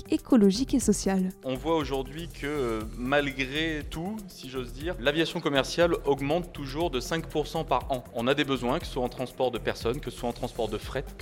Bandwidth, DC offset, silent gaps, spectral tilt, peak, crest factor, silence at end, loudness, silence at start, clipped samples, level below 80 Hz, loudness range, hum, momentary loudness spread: 17 kHz; under 0.1%; none; -5 dB/octave; -8 dBFS; 20 dB; 0 s; -28 LUFS; 0 s; under 0.1%; -44 dBFS; 3 LU; none; 11 LU